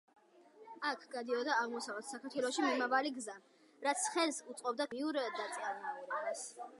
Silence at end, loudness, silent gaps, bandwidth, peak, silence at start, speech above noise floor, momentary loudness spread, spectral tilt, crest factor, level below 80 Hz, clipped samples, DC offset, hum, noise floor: 0 s; -38 LUFS; none; 11.5 kHz; -18 dBFS; 0.55 s; 24 dB; 10 LU; -1 dB/octave; 20 dB; under -90 dBFS; under 0.1%; under 0.1%; none; -62 dBFS